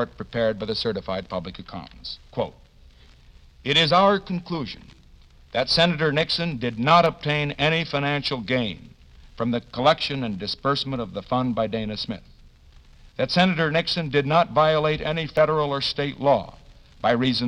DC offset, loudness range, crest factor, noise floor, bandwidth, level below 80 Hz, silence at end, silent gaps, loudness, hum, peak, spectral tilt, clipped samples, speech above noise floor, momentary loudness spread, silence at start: under 0.1%; 5 LU; 20 dB; -50 dBFS; 11 kHz; -48 dBFS; 0 s; none; -23 LUFS; none; -4 dBFS; -6 dB/octave; under 0.1%; 28 dB; 14 LU; 0 s